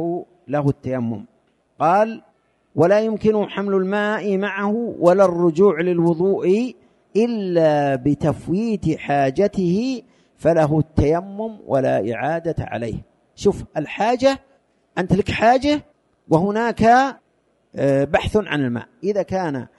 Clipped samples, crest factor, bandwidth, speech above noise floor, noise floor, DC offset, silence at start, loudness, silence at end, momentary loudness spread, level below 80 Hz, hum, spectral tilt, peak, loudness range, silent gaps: under 0.1%; 18 dB; 11.5 kHz; 45 dB; -63 dBFS; under 0.1%; 0 s; -19 LUFS; 0.1 s; 11 LU; -44 dBFS; none; -7 dB/octave; -2 dBFS; 4 LU; none